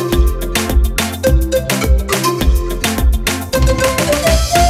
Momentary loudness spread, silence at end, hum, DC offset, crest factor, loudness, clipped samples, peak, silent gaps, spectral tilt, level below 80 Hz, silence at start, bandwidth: 3 LU; 0 s; none; under 0.1%; 12 dB; -15 LUFS; under 0.1%; 0 dBFS; none; -4.5 dB/octave; -16 dBFS; 0 s; 16 kHz